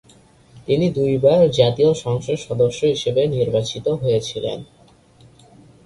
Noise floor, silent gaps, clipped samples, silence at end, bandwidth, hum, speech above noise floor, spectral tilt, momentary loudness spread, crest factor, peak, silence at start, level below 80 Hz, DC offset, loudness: -50 dBFS; none; under 0.1%; 1.2 s; 11.5 kHz; none; 32 dB; -6.5 dB/octave; 11 LU; 18 dB; -2 dBFS; 0.55 s; -50 dBFS; under 0.1%; -19 LUFS